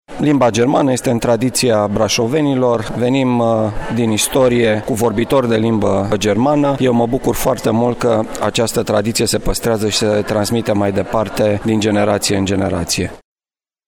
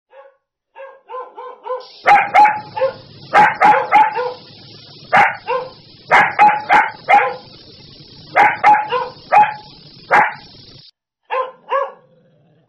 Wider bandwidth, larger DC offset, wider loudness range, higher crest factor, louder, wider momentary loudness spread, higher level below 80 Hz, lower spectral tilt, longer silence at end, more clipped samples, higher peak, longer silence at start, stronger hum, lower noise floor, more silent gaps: first, 19 kHz vs 9.6 kHz; neither; about the same, 2 LU vs 4 LU; about the same, 12 dB vs 14 dB; about the same, -15 LUFS vs -14 LUFS; second, 4 LU vs 21 LU; first, -36 dBFS vs -58 dBFS; about the same, -5 dB/octave vs -4 dB/octave; about the same, 0.7 s vs 0.75 s; neither; about the same, -2 dBFS vs -2 dBFS; second, 0.1 s vs 0.8 s; neither; first, under -90 dBFS vs -54 dBFS; neither